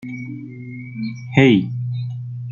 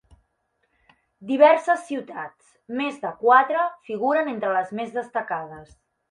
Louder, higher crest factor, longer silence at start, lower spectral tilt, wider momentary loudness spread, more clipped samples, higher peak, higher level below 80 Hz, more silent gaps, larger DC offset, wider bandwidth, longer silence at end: first, -19 LUFS vs -22 LUFS; about the same, 18 dB vs 20 dB; second, 0 s vs 1.2 s; first, -8 dB/octave vs -5 dB/octave; about the same, 19 LU vs 18 LU; neither; about the same, -2 dBFS vs -4 dBFS; first, -58 dBFS vs -66 dBFS; neither; neither; second, 7.2 kHz vs 11 kHz; second, 0 s vs 0.45 s